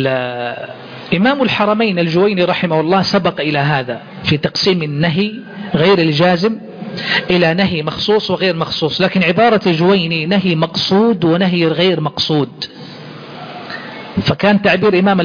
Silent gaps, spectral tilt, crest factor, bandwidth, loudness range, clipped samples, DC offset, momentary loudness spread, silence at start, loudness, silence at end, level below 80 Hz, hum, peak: none; -6.5 dB/octave; 14 dB; 5.4 kHz; 3 LU; under 0.1%; under 0.1%; 15 LU; 0 s; -14 LUFS; 0 s; -48 dBFS; none; 0 dBFS